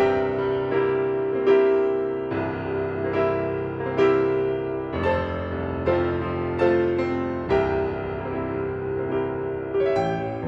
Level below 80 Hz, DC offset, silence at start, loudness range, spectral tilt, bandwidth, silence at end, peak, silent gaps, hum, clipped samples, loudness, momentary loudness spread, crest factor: -46 dBFS; under 0.1%; 0 s; 2 LU; -8.5 dB/octave; 6 kHz; 0 s; -8 dBFS; none; none; under 0.1%; -24 LUFS; 8 LU; 16 dB